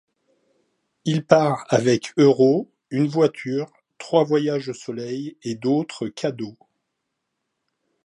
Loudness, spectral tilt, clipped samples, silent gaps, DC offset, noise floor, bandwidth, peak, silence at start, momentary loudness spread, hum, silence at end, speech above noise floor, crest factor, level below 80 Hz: -21 LUFS; -6.5 dB/octave; under 0.1%; none; under 0.1%; -78 dBFS; 11 kHz; 0 dBFS; 1.05 s; 13 LU; none; 1.55 s; 58 dB; 22 dB; -70 dBFS